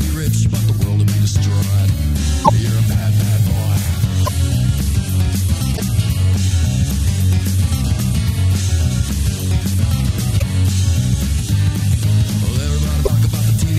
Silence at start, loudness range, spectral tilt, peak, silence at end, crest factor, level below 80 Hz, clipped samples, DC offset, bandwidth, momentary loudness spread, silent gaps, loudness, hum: 0 s; 1 LU; -5.5 dB/octave; 0 dBFS; 0 s; 14 dB; -24 dBFS; under 0.1%; under 0.1%; 15.5 kHz; 3 LU; none; -17 LUFS; none